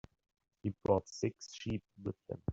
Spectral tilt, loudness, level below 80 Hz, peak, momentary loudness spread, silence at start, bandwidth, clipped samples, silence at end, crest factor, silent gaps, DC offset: -6.5 dB/octave; -39 LUFS; -62 dBFS; -16 dBFS; 11 LU; 0.65 s; 8 kHz; under 0.1%; 0 s; 24 dB; none; under 0.1%